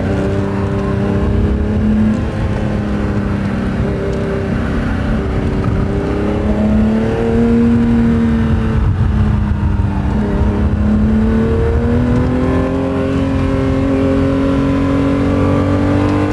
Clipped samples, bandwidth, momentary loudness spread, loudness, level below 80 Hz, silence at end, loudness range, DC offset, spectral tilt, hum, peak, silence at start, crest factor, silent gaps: under 0.1%; 11 kHz; 4 LU; -15 LUFS; -20 dBFS; 0 s; 3 LU; under 0.1%; -9 dB/octave; none; -2 dBFS; 0 s; 12 dB; none